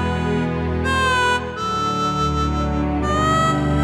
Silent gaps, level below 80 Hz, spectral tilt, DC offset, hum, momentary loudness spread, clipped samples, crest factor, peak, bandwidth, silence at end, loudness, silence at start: none; -30 dBFS; -5.5 dB/octave; under 0.1%; none; 5 LU; under 0.1%; 12 dB; -6 dBFS; 12.5 kHz; 0 s; -19 LUFS; 0 s